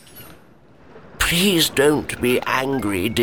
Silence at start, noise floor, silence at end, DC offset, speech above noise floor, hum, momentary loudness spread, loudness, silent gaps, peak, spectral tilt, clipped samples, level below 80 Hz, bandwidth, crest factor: 0.15 s; -50 dBFS; 0 s; 0.5%; 31 dB; none; 6 LU; -18 LUFS; none; -4 dBFS; -3.5 dB/octave; under 0.1%; -40 dBFS; over 20 kHz; 18 dB